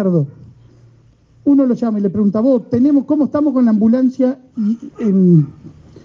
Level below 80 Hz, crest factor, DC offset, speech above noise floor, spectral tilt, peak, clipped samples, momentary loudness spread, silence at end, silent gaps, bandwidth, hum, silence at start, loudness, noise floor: -56 dBFS; 14 dB; under 0.1%; 35 dB; -11 dB/octave; -2 dBFS; under 0.1%; 8 LU; 0.35 s; none; 6.6 kHz; none; 0 s; -15 LUFS; -49 dBFS